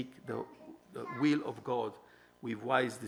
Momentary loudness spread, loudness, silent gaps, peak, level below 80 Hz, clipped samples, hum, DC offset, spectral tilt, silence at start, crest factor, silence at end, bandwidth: 16 LU; -36 LUFS; none; -14 dBFS; -80 dBFS; under 0.1%; none; under 0.1%; -6 dB/octave; 0 s; 22 dB; 0 s; over 20 kHz